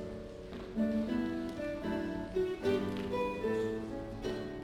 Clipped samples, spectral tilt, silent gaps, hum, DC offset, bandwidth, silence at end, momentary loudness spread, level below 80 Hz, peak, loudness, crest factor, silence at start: under 0.1%; -7 dB/octave; none; none; under 0.1%; 16.5 kHz; 0 s; 8 LU; -54 dBFS; -20 dBFS; -36 LUFS; 16 dB; 0 s